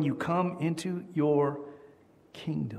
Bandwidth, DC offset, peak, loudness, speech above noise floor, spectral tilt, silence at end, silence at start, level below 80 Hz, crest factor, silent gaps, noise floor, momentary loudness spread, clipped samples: 13.5 kHz; under 0.1%; -14 dBFS; -30 LUFS; 28 dB; -7.5 dB/octave; 0 s; 0 s; -68 dBFS; 16 dB; none; -58 dBFS; 16 LU; under 0.1%